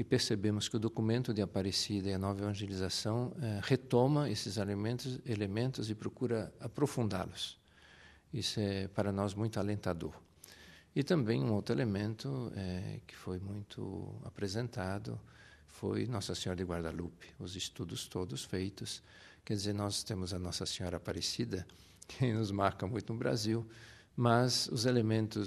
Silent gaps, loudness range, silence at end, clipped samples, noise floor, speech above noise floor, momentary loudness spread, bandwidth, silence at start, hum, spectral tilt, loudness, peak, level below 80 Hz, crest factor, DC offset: none; 6 LU; 0 s; under 0.1%; -60 dBFS; 25 dB; 13 LU; 13.5 kHz; 0 s; none; -5.5 dB/octave; -36 LUFS; -14 dBFS; -64 dBFS; 22 dB; under 0.1%